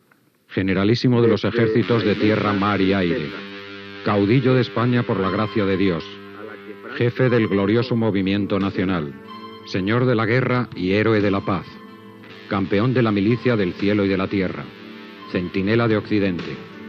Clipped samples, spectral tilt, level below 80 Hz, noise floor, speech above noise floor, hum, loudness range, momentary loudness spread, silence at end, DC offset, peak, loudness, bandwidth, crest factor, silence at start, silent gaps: under 0.1%; -8.5 dB/octave; -58 dBFS; -58 dBFS; 39 dB; none; 2 LU; 18 LU; 0 s; under 0.1%; -6 dBFS; -20 LUFS; 6.6 kHz; 14 dB; 0.5 s; none